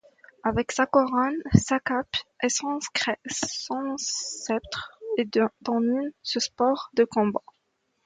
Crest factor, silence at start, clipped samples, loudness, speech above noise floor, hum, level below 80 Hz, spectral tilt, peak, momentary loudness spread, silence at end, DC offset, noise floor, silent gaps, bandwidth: 24 dB; 0.45 s; under 0.1%; -26 LUFS; 48 dB; none; -52 dBFS; -4 dB/octave; -2 dBFS; 8 LU; 0.65 s; under 0.1%; -74 dBFS; none; 9.6 kHz